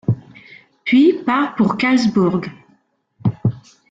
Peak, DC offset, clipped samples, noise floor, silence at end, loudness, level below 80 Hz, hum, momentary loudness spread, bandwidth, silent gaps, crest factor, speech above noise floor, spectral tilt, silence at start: -4 dBFS; under 0.1%; under 0.1%; -60 dBFS; 0.3 s; -17 LUFS; -54 dBFS; none; 13 LU; 7.8 kHz; none; 14 dB; 45 dB; -7 dB/octave; 0.1 s